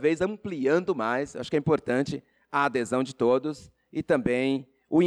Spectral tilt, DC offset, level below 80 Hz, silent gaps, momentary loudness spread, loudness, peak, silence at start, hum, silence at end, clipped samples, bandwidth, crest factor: -6.5 dB/octave; under 0.1%; -60 dBFS; none; 9 LU; -27 LUFS; -12 dBFS; 0 s; none; 0 s; under 0.1%; 11.5 kHz; 14 dB